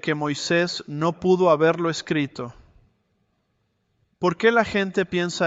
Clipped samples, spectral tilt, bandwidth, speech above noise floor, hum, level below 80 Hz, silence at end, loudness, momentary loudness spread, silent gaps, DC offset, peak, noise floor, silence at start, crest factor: under 0.1%; -5 dB/octave; 8 kHz; 49 dB; none; -58 dBFS; 0 s; -22 LUFS; 8 LU; none; under 0.1%; -4 dBFS; -71 dBFS; 0.05 s; 18 dB